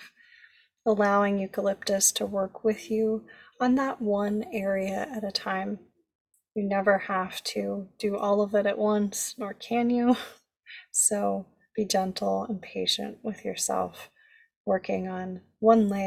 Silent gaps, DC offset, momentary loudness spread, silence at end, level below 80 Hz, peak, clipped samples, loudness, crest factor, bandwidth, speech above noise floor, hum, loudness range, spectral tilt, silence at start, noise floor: 6.15-6.25 s, 14.56-14.65 s; under 0.1%; 13 LU; 0 s; -66 dBFS; -8 dBFS; under 0.1%; -27 LUFS; 20 dB; 16 kHz; 32 dB; none; 4 LU; -3.5 dB/octave; 0 s; -59 dBFS